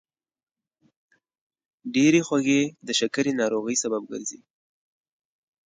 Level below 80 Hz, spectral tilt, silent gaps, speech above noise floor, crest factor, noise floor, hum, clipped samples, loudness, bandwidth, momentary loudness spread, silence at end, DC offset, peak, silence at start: -74 dBFS; -3.5 dB/octave; none; over 67 dB; 18 dB; under -90 dBFS; none; under 0.1%; -24 LUFS; 9.6 kHz; 14 LU; 1.3 s; under 0.1%; -8 dBFS; 1.85 s